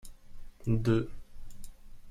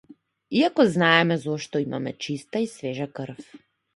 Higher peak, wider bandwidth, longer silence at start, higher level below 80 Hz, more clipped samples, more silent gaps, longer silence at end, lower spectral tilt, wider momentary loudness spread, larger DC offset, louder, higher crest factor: second, -16 dBFS vs -2 dBFS; first, 13.5 kHz vs 11.5 kHz; second, 0.05 s vs 0.5 s; first, -44 dBFS vs -68 dBFS; neither; neither; second, 0 s vs 0.4 s; first, -8 dB/octave vs -5.5 dB/octave; first, 26 LU vs 15 LU; neither; second, -32 LUFS vs -23 LUFS; second, 16 dB vs 24 dB